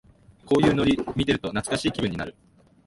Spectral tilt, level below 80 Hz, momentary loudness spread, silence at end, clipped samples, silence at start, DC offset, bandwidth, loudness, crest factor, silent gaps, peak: -5.5 dB/octave; -46 dBFS; 9 LU; 0.55 s; under 0.1%; 0.45 s; under 0.1%; 11.5 kHz; -24 LUFS; 18 dB; none; -6 dBFS